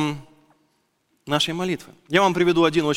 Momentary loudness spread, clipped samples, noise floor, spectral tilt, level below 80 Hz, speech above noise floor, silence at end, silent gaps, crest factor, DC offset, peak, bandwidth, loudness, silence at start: 11 LU; under 0.1%; -68 dBFS; -5 dB/octave; -54 dBFS; 48 dB; 0 s; none; 20 dB; under 0.1%; -2 dBFS; 15.5 kHz; -21 LUFS; 0 s